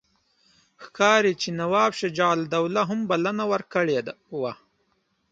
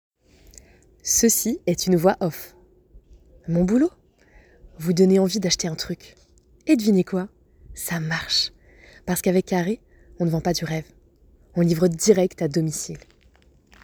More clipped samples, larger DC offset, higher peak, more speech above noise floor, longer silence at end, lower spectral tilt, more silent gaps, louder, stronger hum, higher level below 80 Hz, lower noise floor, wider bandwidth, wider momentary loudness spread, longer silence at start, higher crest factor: neither; neither; about the same, -4 dBFS vs -2 dBFS; first, 47 dB vs 35 dB; about the same, 0.8 s vs 0.85 s; about the same, -4.5 dB/octave vs -4.5 dB/octave; neither; about the same, -24 LUFS vs -22 LUFS; neither; second, -68 dBFS vs -50 dBFS; first, -70 dBFS vs -56 dBFS; second, 9.2 kHz vs over 20 kHz; second, 12 LU vs 15 LU; second, 0.8 s vs 1.05 s; about the same, 20 dB vs 20 dB